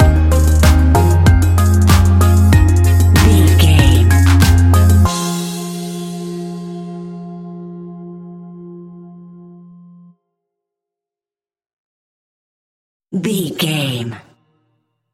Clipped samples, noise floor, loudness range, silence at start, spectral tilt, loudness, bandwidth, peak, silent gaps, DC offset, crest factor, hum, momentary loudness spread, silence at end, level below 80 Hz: under 0.1%; under -90 dBFS; 21 LU; 0 s; -6 dB/octave; -12 LUFS; 15.5 kHz; 0 dBFS; 11.73-13.00 s; under 0.1%; 14 dB; none; 21 LU; 0.95 s; -20 dBFS